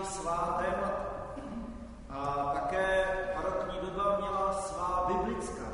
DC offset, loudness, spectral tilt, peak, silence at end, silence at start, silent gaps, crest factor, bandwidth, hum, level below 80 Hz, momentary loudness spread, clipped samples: under 0.1%; -33 LUFS; -5 dB/octave; -18 dBFS; 0 s; 0 s; none; 14 dB; 11 kHz; none; -48 dBFS; 11 LU; under 0.1%